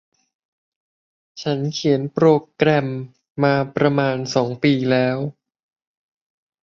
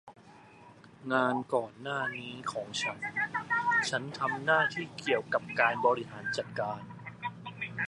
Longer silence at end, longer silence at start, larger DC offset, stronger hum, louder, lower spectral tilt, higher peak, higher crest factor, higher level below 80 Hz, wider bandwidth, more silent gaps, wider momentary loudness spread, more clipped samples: first, 1.35 s vs 0 s; first, 1.35 s vs 0.05 s; neither; neither; first, -19 LUFS vs -31 LUFS; first, -6.5 dB/octave vs -4 dB/octave; first, -2 dBFS vs -10 dBFS; about the same, 20 dB vs 22 dB; first, -62 dBFS vs -72 dBFS; second, 7.4 kHz vs 11.5 kHz; first, 3.30-3.35 s vs none; about the same, 11 LU vs 13 LU; neither